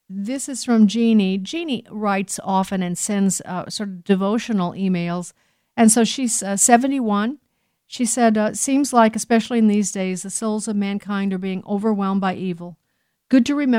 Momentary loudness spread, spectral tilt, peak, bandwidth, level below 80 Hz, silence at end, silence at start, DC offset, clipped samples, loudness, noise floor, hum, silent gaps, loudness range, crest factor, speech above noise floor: 11 LU; -4.5 dB/octave; 0 dBFS; 16 kHz; -64 dBFS; 0 s; 0.1 s; under 0.1%; under 0.1%; -20 LUFS; -71 dBFS; none; none; 4 LU; 18 dB; 52 dB